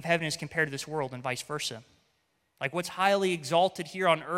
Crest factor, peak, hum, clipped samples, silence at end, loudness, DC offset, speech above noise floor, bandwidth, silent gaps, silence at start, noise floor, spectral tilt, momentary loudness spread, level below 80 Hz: 20 dB; -10 dBFS; none; under 0.1%; 0 s; -29 LUFS; under 0.1%; 45 dB; 16.5 kHz; none; 0 s; -74 dBFS; -4 dB/octave; 8 LU; -72 dBFS